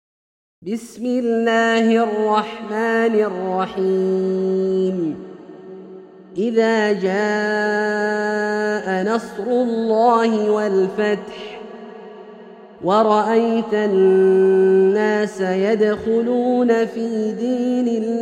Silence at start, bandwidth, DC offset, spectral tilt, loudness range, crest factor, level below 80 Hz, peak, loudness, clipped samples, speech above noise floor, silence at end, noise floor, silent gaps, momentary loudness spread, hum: 0.6 s; 10 kHz; under 0.1%; -6.5 dB/octave; 5 LU; 16 dB; -62 dBFS; -2 dBFS; -18 LUFS; under 0.1%; 23 dB; 0 s; -40 dBFS; none; 17 LU; none